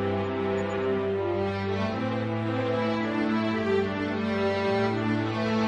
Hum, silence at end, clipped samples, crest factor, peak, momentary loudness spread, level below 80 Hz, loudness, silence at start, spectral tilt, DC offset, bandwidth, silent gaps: none; 0 s; under 0.1%; 12 dB; -14 dBFS; 3 LU; -58 dBFS; -27 LUFS; 0 s; -7.5 dB/octave; under 0.1%; 8.8 kHz; none